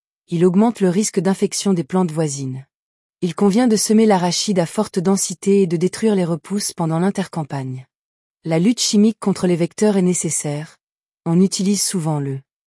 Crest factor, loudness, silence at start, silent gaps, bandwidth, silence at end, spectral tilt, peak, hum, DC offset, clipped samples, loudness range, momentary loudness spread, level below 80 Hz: 14 dB; -18 LUFS; 0.3 s; 2.74-3.15 s, 7.95-8.37 s, 10.83-11.01 s, 11.11-11.18 s; 12 kHz; 0.25 s; -5 dB/octave; -4 dBFS; none; under 0.1%; under 0.1%; 3 LU; 12 LU; -64 dBFS